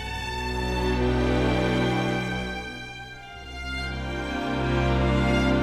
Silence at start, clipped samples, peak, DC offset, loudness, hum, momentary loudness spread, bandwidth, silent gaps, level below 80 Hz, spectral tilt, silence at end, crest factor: 0 s; under 0.1%; -10 dBFS; under 0.1%; -26 LUFS; none; 14 LU; 13 kHz; none; -32 dBFS; -6.5 dB/octave; 0 s; 14 dB